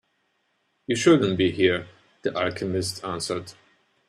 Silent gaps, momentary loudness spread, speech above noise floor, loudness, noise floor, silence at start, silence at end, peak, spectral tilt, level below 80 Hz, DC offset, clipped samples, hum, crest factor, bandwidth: none; 13 LU; 48 dB; -24 LUFS; -71 dBFS; 0.9 s; 0.55 s; -4 dBFS; -5 dB/octave; -62 dBFS; under 0.1%; under 0.1%; none; 20 dB; 13 kHz